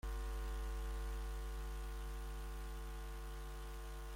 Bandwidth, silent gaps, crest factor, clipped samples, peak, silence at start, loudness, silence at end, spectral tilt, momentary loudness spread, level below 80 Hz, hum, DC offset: 16.5 kHz; none; 8 dB; under 0.1%; -36 dBFS; 0.05 s; -48 LUFS; 0 s; -5 dB/octave; 4 LU; -44 dBFS; none; under 0.1%